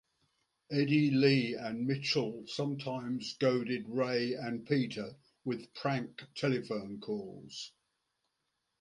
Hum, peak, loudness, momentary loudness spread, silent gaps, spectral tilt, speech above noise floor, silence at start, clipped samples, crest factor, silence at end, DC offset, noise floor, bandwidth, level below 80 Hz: none; -12 dBFS; -34 LUFS; 15 LU; none; -6 dB/octave; 50 dB; 0.7 s; under 0.1%; 22 dB; 1.1 s; under 0.1%; -83 dBFS; 11 kHz; -76 dBFS